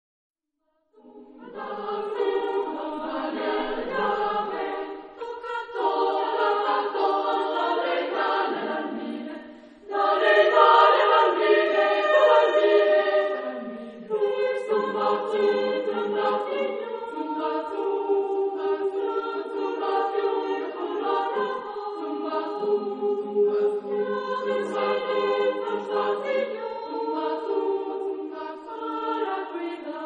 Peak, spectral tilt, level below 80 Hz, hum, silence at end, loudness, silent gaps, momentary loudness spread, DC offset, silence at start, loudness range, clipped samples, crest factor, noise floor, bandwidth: -4 dBFS; -5 dB/octave; -68 dBFS; none; 0 s; -25 LUFS; none; 13 LU; under 0.1%; 1.05 s; 9 LU; under 0.1%; 20 dB; -74 dBFS; 7.6 kHz